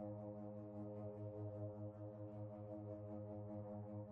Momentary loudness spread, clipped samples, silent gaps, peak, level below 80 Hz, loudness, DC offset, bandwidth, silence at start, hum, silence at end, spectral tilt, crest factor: 2 LU; under 0.1%; none; -38 dBFS; -78 dBFS; -52 LUFS; under 0.1%; 2.8 kHz; 0 s; none; 0 s; -10.5 dB/octave; 12 dB